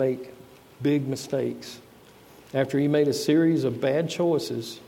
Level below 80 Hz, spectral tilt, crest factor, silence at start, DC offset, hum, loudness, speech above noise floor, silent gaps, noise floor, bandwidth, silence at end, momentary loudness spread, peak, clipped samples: -68 dBFS; -6 dB/octave; 14 dB; 0 s; under 0.1%; none; -25 LUFS; 27 dB; none; -51 dBFS; 16.5 kHz; 0 s; 14 LU; -10 dBFS; under 0.1%